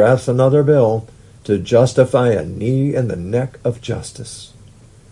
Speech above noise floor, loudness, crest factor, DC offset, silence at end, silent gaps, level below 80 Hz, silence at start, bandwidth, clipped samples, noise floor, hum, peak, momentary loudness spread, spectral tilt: 28 dB; -16 LUFS; 16 dB; under 0.1%; 0.65 s; none; -48 dBFS; 0 s; 11.5 kHz; under 0.1%; -43 dBFS; none; 0 dBFS; 17 LU; -7 dB/octave